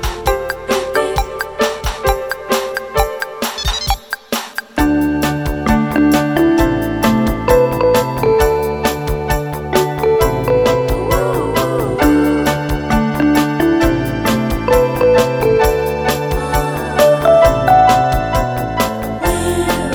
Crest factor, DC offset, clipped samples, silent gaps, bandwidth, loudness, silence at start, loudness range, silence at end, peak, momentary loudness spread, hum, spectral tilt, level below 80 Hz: 14 dB; under 0.1%; under 0.1%; none; over 20 kHz; -15 LUFS; 0 s; 5 LU; 0 s; 0 dBFS; 7 LU; none; -5.5 dB/octave; -26 dBFS